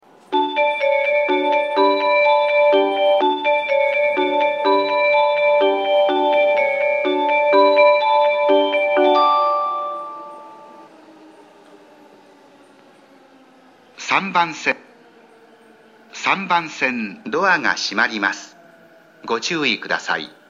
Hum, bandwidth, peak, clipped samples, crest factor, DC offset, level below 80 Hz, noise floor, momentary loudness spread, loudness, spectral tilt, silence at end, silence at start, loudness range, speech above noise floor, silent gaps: none; 7.6 kHz; -2 dBFS; under 0.1%; 18 dB; under 0.1%; -72 dBFS; -49 dBFS; 9 LU; -17 LUFS; -3.5 dB/octave; 0.2 s; 0.3 s; 9 LU; 29 dB; none